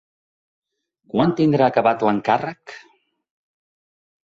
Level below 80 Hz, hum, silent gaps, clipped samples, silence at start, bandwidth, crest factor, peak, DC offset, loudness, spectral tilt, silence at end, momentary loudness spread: -60 dBFS; none; none; under 0.1%; 1.15 s; 7.6 kHz; 18 dB; -4 dBFS; under 0.1%; -19 LUFS; -8 dB/octave; 1.45 s; 16 LU